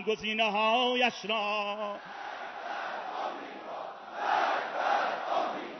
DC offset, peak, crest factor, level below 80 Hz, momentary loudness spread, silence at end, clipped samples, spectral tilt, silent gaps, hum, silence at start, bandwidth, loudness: under 0.1%; -14 dBFS; 18 dB; -76 dBFS; 15 LU; 0 s; under 0.1%; 0 dB/octave; none; none; 0 s; 6.2 kHz; -31 LUFS